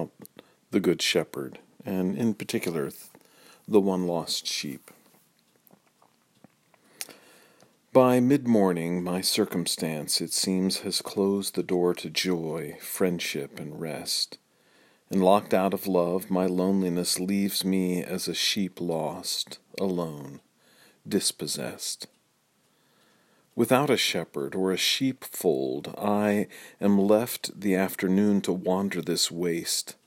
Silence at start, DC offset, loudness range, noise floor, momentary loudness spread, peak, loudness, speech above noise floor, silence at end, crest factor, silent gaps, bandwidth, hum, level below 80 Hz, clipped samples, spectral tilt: 0 s; under 0.1%; 6 LU; -68 dBFS; 12 LU; -4 dBFS; -26 LUFS; 42 dB; 0.15 s; 22 dB; none; 16.5 kHz; none; -72 dBFS; under 0.1%; -4 dB/octave